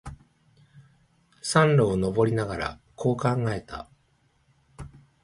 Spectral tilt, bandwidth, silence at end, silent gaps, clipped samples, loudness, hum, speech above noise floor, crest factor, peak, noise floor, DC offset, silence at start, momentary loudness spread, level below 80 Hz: -6 dB/octave; 11.5 kHz; 0.35 s; none; under 0.1%; -25 LUFS; none; 43 dB; 20 dB; -6 dBFS; -66 dBFS; under 0.1%; 0.05 s; 25 LU; -50 dBFS